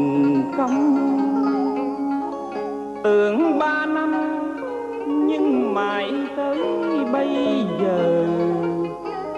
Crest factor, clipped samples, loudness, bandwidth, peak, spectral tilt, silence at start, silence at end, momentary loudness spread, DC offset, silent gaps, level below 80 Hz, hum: 12 dB; under 0.1%; -21 LUFS; 8 kHz; -8 dBFS; -7 dB/octave; 0 s; 0 s; 9 LU; under 0.1%; none; -60 dBFS; 50 Hz at -60 dBFS